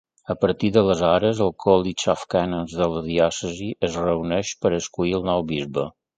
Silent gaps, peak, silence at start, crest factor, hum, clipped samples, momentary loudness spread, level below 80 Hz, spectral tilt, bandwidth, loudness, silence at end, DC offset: none; -2 dBFS; 0.3 s; 20 dB; none; under 0.1%; 7 LU; -46 dBFS; -5.5 dB/octave; 9.4 kHz; -22 LUFS; 0.25 s; under 0.1%